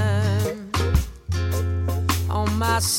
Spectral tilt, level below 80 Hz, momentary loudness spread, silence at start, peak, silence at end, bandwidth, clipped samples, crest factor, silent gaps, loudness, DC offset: -4.5 dB/octave; -30 dBFS; 4 LU; 0 s; -8 dBFS; 0 s; 17 kHz; under 0.1%; 14 dB; none; -23 LUFS; under 0.1%